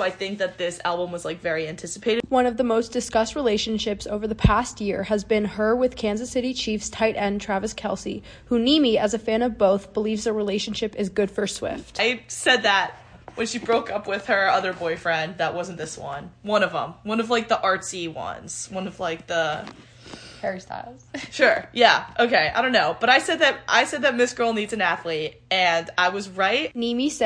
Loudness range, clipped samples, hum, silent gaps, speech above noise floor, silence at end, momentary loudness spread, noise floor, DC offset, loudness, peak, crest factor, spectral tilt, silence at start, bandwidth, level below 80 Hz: 6 LU; under 0.1%; none; none; 19 dB; 0 s; 12 LU; -43 dBFS; under 0.1%; -23 LUFS; -2 dBFS; 22 dB; -3.5 dB/octave; 0 s; 10.5 kHz; -44 dBFS